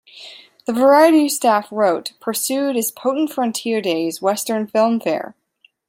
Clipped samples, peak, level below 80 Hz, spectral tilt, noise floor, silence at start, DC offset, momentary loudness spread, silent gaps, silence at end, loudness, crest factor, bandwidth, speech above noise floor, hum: under 0.1%; -2 dBFS; -72 dBFS; -3.5 dB/octave; -58 dBFS; 0.15 s; under 0.1%; 13 LU; none; 0.6 s; -18 LUFS; 16 dB; 16.5 kHz; 41 dB; none